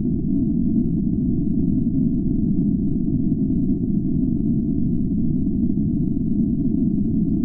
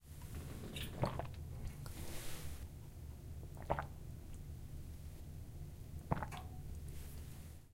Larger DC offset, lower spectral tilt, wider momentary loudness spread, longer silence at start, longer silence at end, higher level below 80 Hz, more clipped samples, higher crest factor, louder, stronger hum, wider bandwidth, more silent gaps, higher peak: neither; first, -16.5 dB/octave vs -5.5 dB/octave; second, 1 LU vs 10 LU; about the same, 0 s vs 0 s; about the same, 0 s vs 0 s; first, -32 dBFS vs -52 dBFS; neither; second, 12 dB vs 28 dB; first, -21 LUFS vs -48 LUFS; neither; second, 1.1 kHz vs 16.5 kHz; neither; first, -8 dBFS vs -18 dBFS